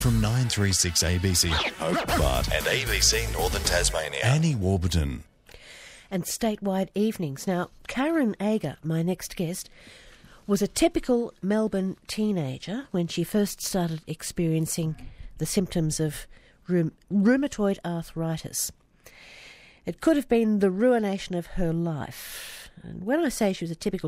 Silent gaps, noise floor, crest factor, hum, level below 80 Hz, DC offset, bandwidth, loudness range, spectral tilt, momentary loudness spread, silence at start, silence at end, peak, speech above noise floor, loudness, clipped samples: none; -52 dBFS; 18 dB; none; -40 dBFS; under 0.1%; 16 kHz; 5 LU; -4.5 dB/octave; 13 LU; 0 s; 0 s; -8 dBFS; 26 dB; -26 LUFS; under 0.1%